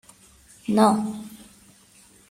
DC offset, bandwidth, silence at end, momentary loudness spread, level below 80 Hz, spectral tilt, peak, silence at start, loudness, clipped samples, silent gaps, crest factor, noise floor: under 0.1%; 15.5 kHz; 0.95 s; 19 LU; -64 dBFS; -6 dB/octave; -6 dBFS; 0.7 s; -22 LUFS; under 0.1%; none; 20 dB; -54 dBFS